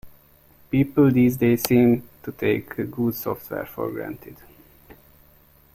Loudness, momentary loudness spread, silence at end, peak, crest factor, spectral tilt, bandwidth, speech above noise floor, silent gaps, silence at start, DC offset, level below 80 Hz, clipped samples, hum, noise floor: -22 LUFS; 14 LU; 1.4 s; -2 dBFS; 22 dB; -7 dB/octave; 16.5 kHz; 33 dB; none; 0.05 s; under 0.1%; -54 dBFS; under 0.1%; none; -55 dBFS